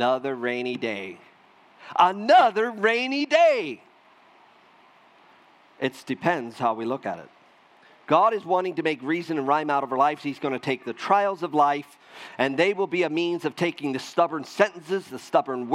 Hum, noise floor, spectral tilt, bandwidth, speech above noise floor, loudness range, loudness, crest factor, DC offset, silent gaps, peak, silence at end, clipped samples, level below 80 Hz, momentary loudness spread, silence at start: none; -56 dBFS; -5 dB/octave; 13.5 kHz; 32 dB; 8 LU; -24 LUFS; 22 dB; under 0.1%; none; -4 dBFS; 0 s; under 0.1%; -82 dBFS; 11 LU; 0 s